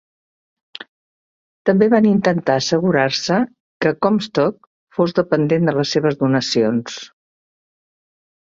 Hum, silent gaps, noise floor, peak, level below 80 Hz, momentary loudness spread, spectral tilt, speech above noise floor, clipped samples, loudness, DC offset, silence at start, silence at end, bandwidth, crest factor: none; 3.60-3.80 s, 4.67-4.87 s; under -90 dBFS; -2 dBFS; -60 dBFS; 13 LU; -5.5 dB/octave; over 74 dB; under 0.1%; -17 LUFS; under 0.1%; 1.65 s; 1.4 s; 7.8 kHz; 18 dB